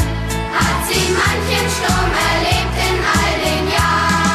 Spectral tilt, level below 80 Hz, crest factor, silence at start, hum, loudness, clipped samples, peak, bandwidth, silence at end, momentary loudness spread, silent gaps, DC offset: -4 dB/octave; -26 dBFS; 12 dB; 0 s; none; -15 LUFS; under 0.1%; -4 dBFS; 14 kHz; 0 s; 3 LU; none; under 0.1%